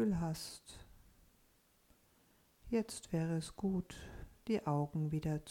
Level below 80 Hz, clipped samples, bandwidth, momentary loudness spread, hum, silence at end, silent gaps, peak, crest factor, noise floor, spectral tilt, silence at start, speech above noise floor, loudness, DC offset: -60 dBFS; under 0.1%; 16.5 kHz; 16 LU; none; 0 s; none; -24 dBFS; 18 dB; -72 dBFS; -6.5 dB/octave; 0 s; 33 dB; -39 LUFS; under 0.1%